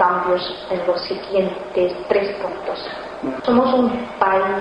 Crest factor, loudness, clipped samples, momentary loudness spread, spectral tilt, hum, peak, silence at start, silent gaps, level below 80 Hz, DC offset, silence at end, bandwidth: 20 dB; -20 LUFS; under 0.1%; 10 LU; -6.5 dB/octave; none; 0 dBFS; 0 s; none; -52 dBFS; under 0.1%; 0 s; 9.8 kHz